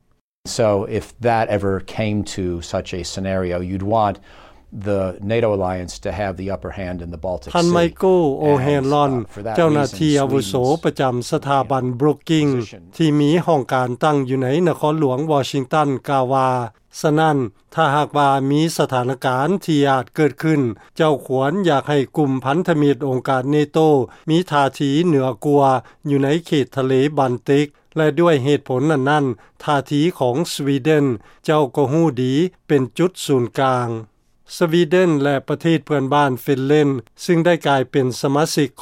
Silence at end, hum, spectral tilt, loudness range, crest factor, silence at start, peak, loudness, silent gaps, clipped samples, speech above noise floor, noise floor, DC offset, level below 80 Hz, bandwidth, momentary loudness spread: 0 s; none; -6.5 dB/octave; 4 LU; 14 dB; 0.45 s; -4 dBFS; -18 LUFS; none; under 0.1%; 21 dB; -39 dBFS; under 0.1%; -48 dBFS; 16 kHz; 8 LU